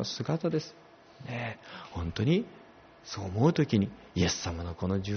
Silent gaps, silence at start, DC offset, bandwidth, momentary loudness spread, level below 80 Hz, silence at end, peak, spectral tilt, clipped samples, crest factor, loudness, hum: none; 0 s; under 0.1%; 6.6 kHz; 16 LU; -52 dBFS; 0 s; -12 dBFS; -6 dB/octave; under 0.1%; 20 dB; -31 LUFS; none